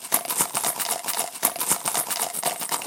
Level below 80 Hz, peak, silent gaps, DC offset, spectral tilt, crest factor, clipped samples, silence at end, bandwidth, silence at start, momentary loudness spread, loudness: -76 dBFS; 0 dBFS; none; under 0.1%; 0 dB/octave; 26 dB; under 0.1%; 0 s; 17.5 kHz; 0 s; 4 LU; -23 LUFS